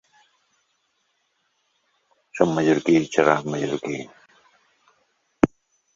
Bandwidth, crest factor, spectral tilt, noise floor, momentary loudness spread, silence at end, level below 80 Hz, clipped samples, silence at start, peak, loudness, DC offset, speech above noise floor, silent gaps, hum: 7.6 kHz; 26 dB; -6 dB/octave; -71 dBFS; 14 LU; 0.5 s; -54 dBFS; under 0.1%; 2.35 s; 0 dBFS; -22 LUFS; under 0.1%; 50 dB; none; none